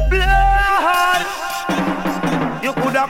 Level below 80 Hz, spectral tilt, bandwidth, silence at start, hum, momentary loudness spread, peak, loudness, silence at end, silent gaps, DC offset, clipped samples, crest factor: -24 dBFS; -4.5 dB/octave; 16.5 kHz; 0 s; none; 7 LU; -2 dBFS; -17 LUFS; 0 s; none; under 0.1%; under 0.1%; 14 dB